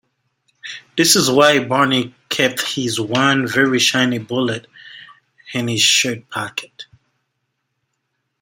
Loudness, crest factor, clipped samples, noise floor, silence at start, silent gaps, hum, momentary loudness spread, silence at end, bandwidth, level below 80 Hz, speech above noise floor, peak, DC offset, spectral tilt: -16 LUFS; 20 dB; under 0.1%; -73 dBFS; 0.65 s; none; none; 15 LU; 1.6 s; 16.5 kHz; -62 dBFS; 56 dB; 0 dBFS; under 0.1%; -3 dB/octave